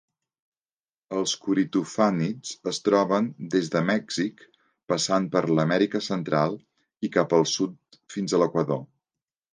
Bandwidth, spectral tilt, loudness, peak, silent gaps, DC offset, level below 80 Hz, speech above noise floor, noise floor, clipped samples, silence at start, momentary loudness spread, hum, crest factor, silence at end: 10 kHz; -5 dB/octave; -25 LUFS; -6 dBFS; none; under 0.1%; -70 dBFS; over 66 dB; under -90 dBFS; under 0.1%; 1.1 s; 9 LU; none; 20 dB; 0.7 s